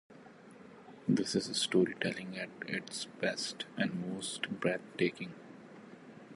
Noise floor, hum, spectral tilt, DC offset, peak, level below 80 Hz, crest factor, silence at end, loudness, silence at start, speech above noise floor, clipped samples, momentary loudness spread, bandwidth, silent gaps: -55 dBFS; none; -4 dB/octave; under 0.1%; -16 dBFS; -76 dBFS; 22 dB; 0 s; -35 LUFS; 0.1 s; 20 dB; under 0.1%; 22 LU; 11.5 kHz; none